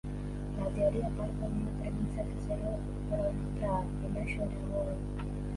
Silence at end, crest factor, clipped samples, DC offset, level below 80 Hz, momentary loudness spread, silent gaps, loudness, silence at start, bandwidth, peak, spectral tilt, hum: 0 s; 16 dB; under 0.1%; under 0.1%; -40 dBFS; 7 LU; none; -35 LUFS; 0.05 s; 11.5 kHz; -18 dBFS; -8.5 dB/octave; 50 Hz at -35 dBFS